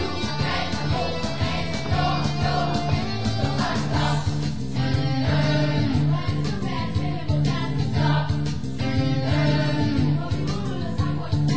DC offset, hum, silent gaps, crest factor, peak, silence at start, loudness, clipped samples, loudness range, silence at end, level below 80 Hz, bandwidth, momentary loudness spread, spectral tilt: 3%; none; none; 14 dB; -8 dBFS; 0 s; -24 LUFS; under 0.1%; 1 LU; 0 s; -36 dBFS; 8 kHz; 5 LU; -6.5 dB/octave